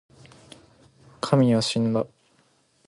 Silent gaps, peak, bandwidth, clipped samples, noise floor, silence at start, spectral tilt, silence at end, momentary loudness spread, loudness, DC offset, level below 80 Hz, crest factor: none; -6 dBFS; 11.5 kHz; under 0.1%; -64 dBFS; 1.25 s; -6 dB/octave; 0.8 s; 14 LU; -23 LUFS; under 0.1%; -62 dBFS; 20 dB